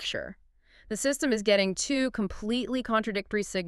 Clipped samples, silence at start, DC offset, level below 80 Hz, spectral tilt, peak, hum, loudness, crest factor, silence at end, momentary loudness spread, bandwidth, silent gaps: under 0.1%; 0 s; under 0.1%; -52 dBFS; -3.5 dB/octave; -10 dBFS; none; -28 LUFS; 18 dB; 0 s; 9 LU; 13.5 kHz; none